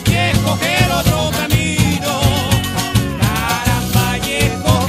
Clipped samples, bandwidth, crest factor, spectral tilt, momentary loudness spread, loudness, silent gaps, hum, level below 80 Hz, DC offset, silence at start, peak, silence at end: under 0.1%; 15.5 kHz; 14 dB; -4.5 dB/octave; 3 LU; -15 LUFS; none; none; -28 dBFS; under 0.1%; 0 s; 0 dBFS; 0 s